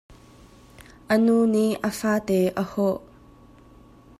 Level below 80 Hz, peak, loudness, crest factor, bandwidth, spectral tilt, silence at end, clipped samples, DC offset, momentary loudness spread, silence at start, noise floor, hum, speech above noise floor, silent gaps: -56 dBFS; -8 dBFS; -23 LUFS; 16 dB; 15.5 kHz; -6 dB/octave; 1.2 s; under 0.1%; under 0.1%; 7 LU; 0.8 s; -50 dBFS; none; 29 dB; none